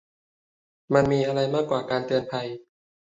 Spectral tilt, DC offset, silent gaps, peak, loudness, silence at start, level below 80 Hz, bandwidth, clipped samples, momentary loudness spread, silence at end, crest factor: -6.5 dB/octave; under 0.1%; none; -6 dBFS; -25 LUFS; 0.9 s; -56 dBFS; 8 kHz; under 0.1%; 11 LU; 0.5 s; 22 dB